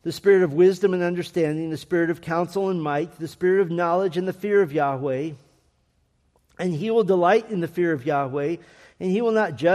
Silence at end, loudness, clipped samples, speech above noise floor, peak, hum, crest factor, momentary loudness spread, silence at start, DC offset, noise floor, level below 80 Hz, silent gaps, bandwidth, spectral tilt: 0 s; -22 LUFS; under 0.1%; 45 dB; -6 dBFS; none; 16 dB; 10 LU; 0.05 s; under 0.1%; -66 dBFS; -66 dBFS; none; 13.5 kHz; -7 dB/octave